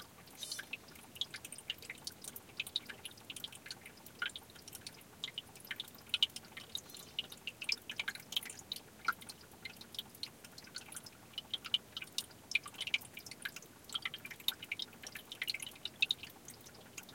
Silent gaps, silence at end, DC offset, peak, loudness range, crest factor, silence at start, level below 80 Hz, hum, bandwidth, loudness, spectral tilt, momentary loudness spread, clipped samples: none; 0 s; under 0.1%; -16 dBFS; 5 LU; 30 dB; 0 s; -76 dBFS; none; 17 kHz; -42 LUFS; -0.5 dB/octave; 13 LU; under 0.1%